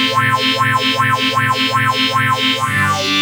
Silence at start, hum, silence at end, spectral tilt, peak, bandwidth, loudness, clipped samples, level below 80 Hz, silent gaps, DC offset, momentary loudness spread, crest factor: 0 s; none; 0 s; -3.5 dB/octave; -2 dBFS; over 20 kHz; -14 LUFS; under 0.1%; -66 dBFS; none; under 0.1%; 1 LU; 12 dB